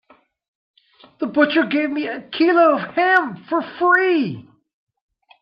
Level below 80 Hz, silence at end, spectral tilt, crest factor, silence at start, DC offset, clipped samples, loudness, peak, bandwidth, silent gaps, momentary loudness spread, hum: -70 dBFS; 1 s; -7 dB/octave; 18 dB; 1.2 s; under 0.1%; under 0.1%; -18 LUFS; -2 dBFS; 5.8 kHz; none; 11 LU; none